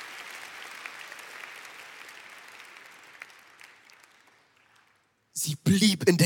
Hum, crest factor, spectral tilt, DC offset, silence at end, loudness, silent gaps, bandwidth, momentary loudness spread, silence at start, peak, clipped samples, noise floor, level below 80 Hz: none; 24 dB; -4.5 dB/octave; under 0.1%; 0 s; -29 LUFS; none; 17.5 kHz; 26 LU; 0 s; -8 dBFS; under 0.1%; -68 dBFS; -68 dBFS